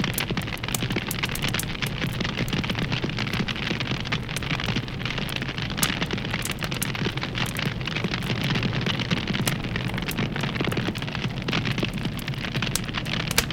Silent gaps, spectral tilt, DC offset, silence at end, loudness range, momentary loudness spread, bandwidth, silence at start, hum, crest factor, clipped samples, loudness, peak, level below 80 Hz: none; -4 dB/octave; under 0.1%; 0 s; 1 LU; 4 LU; 17 kHz; 0 s; none; 26 dB; under 0.1%; -26 LUFS; 0 dBFS; -40 dBFS